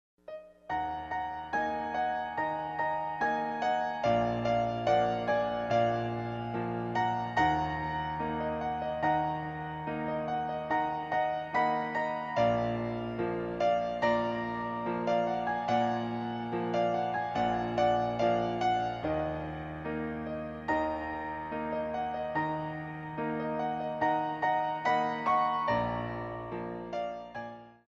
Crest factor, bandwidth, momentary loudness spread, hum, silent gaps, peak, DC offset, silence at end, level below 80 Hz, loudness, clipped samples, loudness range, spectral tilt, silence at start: 16 dB; 7.4 kHz; 9 LU; none; none; -16 dBFS; under 0.1%; 0.15 s; -56 dBFS; -32 LUFS; under 0.1%; 4 LU; -6.5 dB/octave; 0.3 s